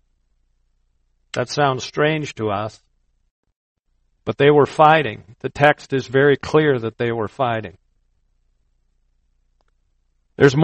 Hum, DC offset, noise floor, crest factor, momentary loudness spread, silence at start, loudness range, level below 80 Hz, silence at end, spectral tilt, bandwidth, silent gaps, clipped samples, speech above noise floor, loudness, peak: none; under 0.1%; -66 dBFS; 20 dB; 16 LU; 1.35 s; 9 LU; -56 dBFS; 0 s; -6 dB/octave; 8.4 kHz; 3.30-3.43 s, 3.56-3.76 s; under 0.1%; 48 dB; -18 LUFS; 0 dBFS